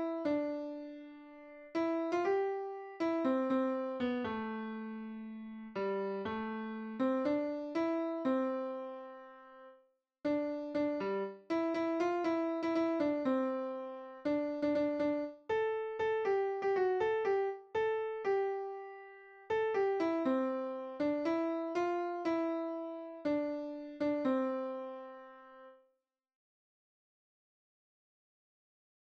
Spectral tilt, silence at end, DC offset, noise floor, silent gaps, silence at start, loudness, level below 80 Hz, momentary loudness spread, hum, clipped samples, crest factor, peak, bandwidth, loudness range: -6.5 dB/octave; 3.45 s; under 0.1%; -82 dBFS; none; 0 s; -36 LUFS; -76 dBFS; 14 LU; none; under 0.1%; 14 dB; -22 dBFS; 7.6 kHz; 5 LU